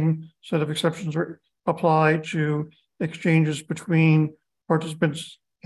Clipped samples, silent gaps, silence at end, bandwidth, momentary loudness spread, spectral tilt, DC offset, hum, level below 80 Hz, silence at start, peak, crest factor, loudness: under 0.1%; none; 0.3 s; 12 kHz; 12 LU; -7 dB/octave; under 0.1%; none; -68 dBFS; 0 s; -6 dBFS; 18 dB; -24 LUFS